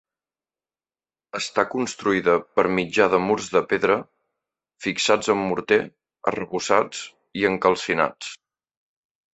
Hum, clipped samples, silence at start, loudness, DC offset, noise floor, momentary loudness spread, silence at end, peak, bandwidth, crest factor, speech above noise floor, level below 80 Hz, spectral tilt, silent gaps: none; under 0.1%; 1.35 s; -22 LUFS; under 0.1%; under -90 dBFS; 10 LU; 1 s; -2 dBFS; 8.4 kHz; 22 dB; over 68 dB; -60 dBFS; -4 dB/octave; none